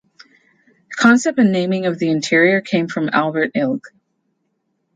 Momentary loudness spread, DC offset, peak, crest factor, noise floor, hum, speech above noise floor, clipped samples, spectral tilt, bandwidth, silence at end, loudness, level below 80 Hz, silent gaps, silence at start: 7 LU; under 0.1%; -2 dBFS; 18 dB; -69 dBFS; none; 53 dB; under 0.1%; -5.5 dB/octave; 9.4 kHz; 1.1 s; -16 LUFS; -66 dBFS; none; 0.9 s